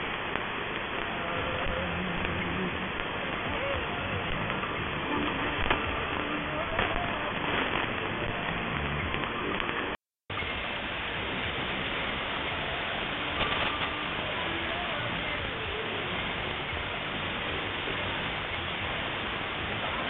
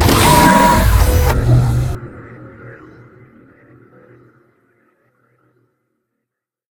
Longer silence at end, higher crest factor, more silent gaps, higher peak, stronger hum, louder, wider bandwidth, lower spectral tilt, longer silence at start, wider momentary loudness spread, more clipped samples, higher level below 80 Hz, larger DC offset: second, 0 s vs 3.95 s; first, 24 dB vs 16 dB; neither; second, -8 dBFS vs 0 dBFS; neither; second, -31 LUFS vs -12 LUFS; second, 4.6 kHz vs 19.5 kHz; second, -2 dB/octave vs -5 dB/octave; about the same, 0 s vs 0 s; second, 3 LU vs 27 LU; neither; second, -46 dBFS vs -22 dBFS; neither